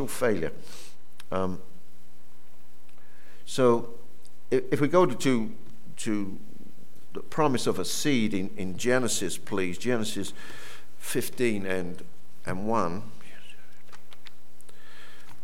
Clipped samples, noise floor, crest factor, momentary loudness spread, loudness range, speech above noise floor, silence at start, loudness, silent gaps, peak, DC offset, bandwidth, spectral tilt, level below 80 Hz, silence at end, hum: under 0.1%; -59 dBFS; 22 dB; 23 LU; 7 LU; 32 dB; 0 s; -28 LUFS; none; -8 dBFS; 5%; 17.5 kHz; -4.5 dB/octave; -64 dBFS; 0.35 s; none